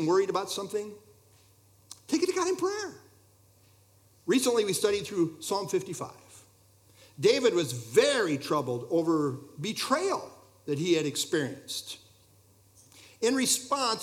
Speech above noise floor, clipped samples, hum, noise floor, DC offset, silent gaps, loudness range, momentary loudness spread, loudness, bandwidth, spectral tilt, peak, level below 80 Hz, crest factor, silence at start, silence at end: 33 dB; under 0.1%; none; -61 dBFS; under 0.1%; none; 5 LU; 14 LU; -28 LUFS; 17.5 kHz; -3.5 dB/octave; -10 dBFS; -74 dBFS; 20 dB; 0 s; 0 s